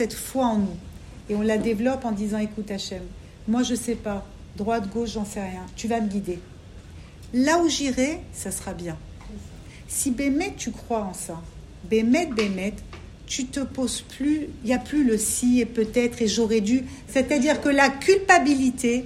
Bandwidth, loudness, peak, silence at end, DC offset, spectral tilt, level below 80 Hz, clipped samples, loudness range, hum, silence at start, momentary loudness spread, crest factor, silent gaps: 15.5 kHz; -24 LUFS; -2 dBFS; 0 s; under 0.1%; -4 dB/octave; -46 dBFS; under 0.1%; 7 LU; none; 0 s; 20 LU; 22 dB; none